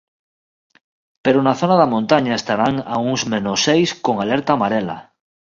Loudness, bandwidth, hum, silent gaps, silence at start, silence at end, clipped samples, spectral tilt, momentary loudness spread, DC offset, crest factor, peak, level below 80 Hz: -17 LUFS; 7.6 kHz; none; none; 1.25 s; 0.4 s; under 0.1%; -5 dB/octave; 6 LU; under 0.1%; 18 dB; 0 dBFS; -56 dBFS